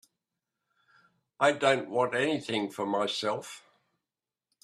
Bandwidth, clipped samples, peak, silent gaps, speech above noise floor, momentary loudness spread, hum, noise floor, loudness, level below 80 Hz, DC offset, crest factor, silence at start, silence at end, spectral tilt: 14 kHz; under 0.1%; -8 dBFS; none; over 61 dB; 10 LU; none; under -90 dBFS; -29 LUFS; -78 dBFS; under 0.1%; 24 dB; 1.4 s; 1.05 s; -4 dB/octave